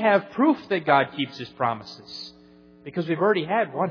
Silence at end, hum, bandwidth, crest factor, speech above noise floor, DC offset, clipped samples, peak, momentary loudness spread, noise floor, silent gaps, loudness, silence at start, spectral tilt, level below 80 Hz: 0 s; none; 5.4 kHz; 20 dB; 28 dB; under 0.1%; under 0.1%; -4 dBFS; 16 LU; -51 dBFS; none; -24 LUFS; 0 s; -7 dB/octave; -68 dBFS